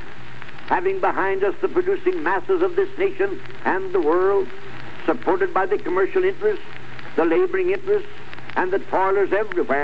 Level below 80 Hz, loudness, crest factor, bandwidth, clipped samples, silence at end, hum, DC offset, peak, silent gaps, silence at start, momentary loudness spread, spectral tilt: -56 dBFS; -22 LUFS; 14 dB; 8 kHz; under 0.1%; 0 s; none; 5%; -8 dBFS; none; 0 s; 16 LU; -7 dB/octave